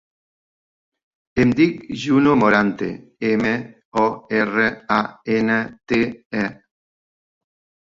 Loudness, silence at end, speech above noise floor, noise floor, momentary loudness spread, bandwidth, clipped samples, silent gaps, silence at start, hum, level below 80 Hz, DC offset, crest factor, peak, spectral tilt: -20 LUFS; 1.3 s; over 71 dB; under -90 dBFS; 11 LU; 7.6 kHz; under 0.1%; 3.85-3.92 s, 6.25-6.30 s; 1.35 s; none; -52 dBFS; under 0.1%; 20 dB; -2 dBFS; -6.5 dB/octave